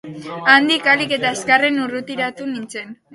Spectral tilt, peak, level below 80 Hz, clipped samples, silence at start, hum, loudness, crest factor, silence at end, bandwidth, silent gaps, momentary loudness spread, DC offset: -3 dB/octave; 0 dBFS; -64 dBFS; under 0.1%; 0.05 s; none; -16 LUFS; 18 dB; 0.2 s; 11.5 kHz; none; 16 LU; under 0.1%